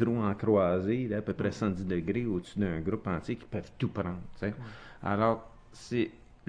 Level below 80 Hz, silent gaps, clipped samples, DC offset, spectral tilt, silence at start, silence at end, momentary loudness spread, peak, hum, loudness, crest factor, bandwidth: -54 dBFS; none; under 0.1%; under 0.1%; -8 dB/octave; 0 s; 0.15 s; 10 LU; -12 dBFS; none; -32 LUFS; 18 dB; 10 kHz